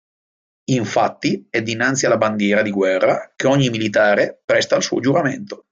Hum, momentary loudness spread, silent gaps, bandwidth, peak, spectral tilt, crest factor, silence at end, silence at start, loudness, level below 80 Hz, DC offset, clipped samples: none; 6 LU; 4.44-4.48 s; 9 kHz; -2 dBFS; -4.5 dB/octave; 16 dB; 0.15 s; 0.7 s; -18 LUFS; -60 dBFS; under 0.1%; under 0.1%